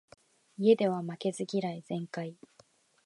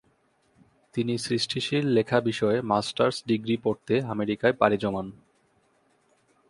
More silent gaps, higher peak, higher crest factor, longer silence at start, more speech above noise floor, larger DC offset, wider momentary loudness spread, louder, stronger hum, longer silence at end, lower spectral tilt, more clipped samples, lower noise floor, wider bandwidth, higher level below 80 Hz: neither; second, -12 dBFS vs -4 dBFS; about the same, 20 dB vs 22 dB; second, 0.6 s vs 0.95 s; second, 34 dB vs 41 dB; neither; first, 15 LU vs 7 LU; second, -31 LUFS vs -26 LUFS; neither; second, 0.75 s vs 1.35 s; about the same, -6.5 dB/octave vs -5.5 dB/octave; neither; about the same, -64 dBFS vs -67 dBFS; about the same, 11.5 kHz vs 11.5 kHz; second, -82 dBFS vs -62 dBFS